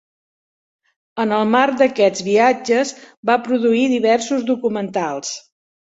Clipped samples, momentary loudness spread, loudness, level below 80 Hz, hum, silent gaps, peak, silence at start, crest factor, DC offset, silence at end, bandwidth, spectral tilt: under 0.1%; 10 LU; -17 LUFS; -64 dBFS; none; 3.17-3.23 s; -2 dBFS; 1.15 s; 16 dB; under 0.1%; 0.55 s; 8 kHz; -4 dB/octave